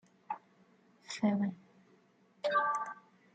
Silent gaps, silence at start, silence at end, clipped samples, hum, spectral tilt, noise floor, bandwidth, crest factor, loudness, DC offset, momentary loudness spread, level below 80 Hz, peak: none; 0.3 s; 0.35 s; under 0.1%; none; -5.5 dB/octave; -67 dBFS; 9 kHz; 18 dB; -36 LUFS; under 0.1%; 14 LU; -84 dBFS; -20 dBFS